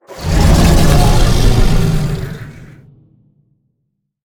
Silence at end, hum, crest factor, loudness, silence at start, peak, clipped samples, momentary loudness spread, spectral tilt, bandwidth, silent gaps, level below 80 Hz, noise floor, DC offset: 1.6 s; none; 12 dB; -13 LUFS; 0.1 s; 0 dBFS; under 0.1%; 15 LU; -5.5 dB/octave; 18.5 kHz; none; -16 dBFS; -69 dBFS; under 0.1%